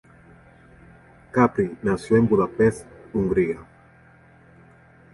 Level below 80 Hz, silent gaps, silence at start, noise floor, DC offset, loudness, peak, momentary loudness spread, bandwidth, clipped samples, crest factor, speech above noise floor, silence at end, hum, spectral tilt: -50 dBFS; none; 1.35 s; -52 dBFS; under 0.1%; -22 LUFS; -2 dBFS; 10 LU; 11.5 kHz; under 0.1%; 22 dB; 32 dB; 1.5 s; none; -8 dB/octave